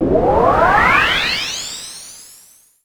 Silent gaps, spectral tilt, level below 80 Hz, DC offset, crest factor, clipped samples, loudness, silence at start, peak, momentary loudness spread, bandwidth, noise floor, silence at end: none; -3.5 dB/octave; -34 dBFS; under 0.1%; 16 dB; under 0.1%; -13 LUFS; 0 s; 0 dBFS; 19 LU; over 20 kHz; -47 dBFS; 0.6 s